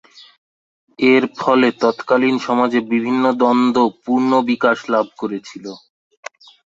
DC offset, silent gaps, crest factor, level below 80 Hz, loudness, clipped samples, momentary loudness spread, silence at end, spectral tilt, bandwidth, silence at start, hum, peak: under 0.1%; none; 16 dB; -64 dBFS; -16 LUFS; under 0.1%; 19 LU; 1 s; -5.5 dB/octave; 7.6 kHz; 1 s; none; -2 dBFS